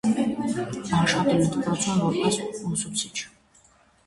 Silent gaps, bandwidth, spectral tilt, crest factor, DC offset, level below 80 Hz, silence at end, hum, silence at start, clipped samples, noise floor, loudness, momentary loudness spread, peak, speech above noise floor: none; 11.5 kHz; -4.5 dB/octave; 16 dB; under 0.1%; -54 dBFS; 0.8 s; none; 0.05 s; under 0.1%; -59 dBFS; -25 LUFS; 8 LU; -10 dBFS; 34 dB